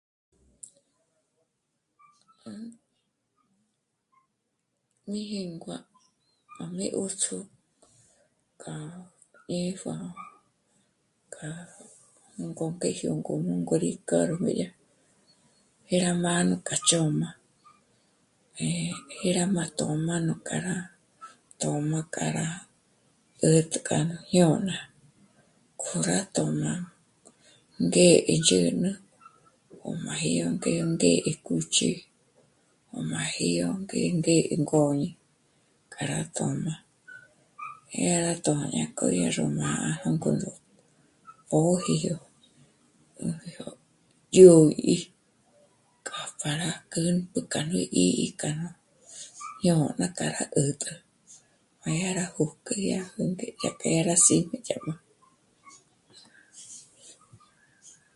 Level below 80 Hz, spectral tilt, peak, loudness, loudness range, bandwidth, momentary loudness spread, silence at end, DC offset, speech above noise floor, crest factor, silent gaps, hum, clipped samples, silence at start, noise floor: -64 dBFS; -4.5 dB/octave; -2 dBFS; -26 LUFS; 15 LU; 11.5 kHz; 20 LU; 0.25 s; under 0.1%; 53 dB; 26 dB; none; none; under 0.1%; 2.45 s; -79 dBFS